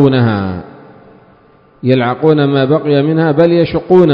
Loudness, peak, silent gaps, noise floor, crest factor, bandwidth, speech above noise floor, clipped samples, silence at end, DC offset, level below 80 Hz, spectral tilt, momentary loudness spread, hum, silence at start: -12 LUFS; 0 dBFS; none; -46 dBFS; 12 dB; 5.4 kHz; 36 dB; 0.7%; 0 s; under 0.1%; -42 dBFS; -10 dB/octave; 9 LU; none; 0 s